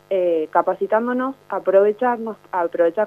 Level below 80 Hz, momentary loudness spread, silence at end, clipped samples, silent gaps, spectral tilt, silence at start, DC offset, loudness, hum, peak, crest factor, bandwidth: -70 dBFS; 9 LU; 0 s; under 0.1%; none; -7.5 dB/octave; 0.1 s; under 0.1%; -20 LUFS; 50 Hz at -60 dBFS; -2 dBFS; 18 dB; 5 kHz